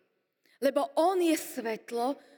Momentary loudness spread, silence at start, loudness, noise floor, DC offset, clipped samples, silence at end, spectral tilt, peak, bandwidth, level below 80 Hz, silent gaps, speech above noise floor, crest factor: 9 LU; 0.6 s; -30 LUFS; -72 dBFS; under 0.1%; under 0.1%; 0.2 s; -3 dB/octave; -14 dBFS; over 20 kHz; under -90 dBFS; none; 43 dB; 16 dB